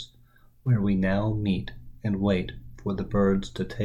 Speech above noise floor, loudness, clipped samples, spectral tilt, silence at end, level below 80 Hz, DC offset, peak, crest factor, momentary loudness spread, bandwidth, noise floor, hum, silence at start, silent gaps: 31 dB; -27 LUFS; under 0.1%; -8 dB/octave; 0 s; -42 dBFS; under 0.1%; -10 dBFS; 16 dB; 12 LU; 8 kHz; -56 dBFS; none; 0 s; none